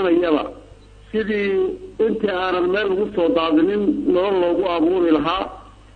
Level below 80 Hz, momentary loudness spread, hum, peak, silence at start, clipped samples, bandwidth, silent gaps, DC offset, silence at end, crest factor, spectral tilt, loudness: -46 dBFS; 8 LU; none; -6 dBFS; 0 s; under 0.1%; 6 kHz; none; under 0.1%; 0.25 s; 14 dB; -7.5 dB/octave; -19 LUFS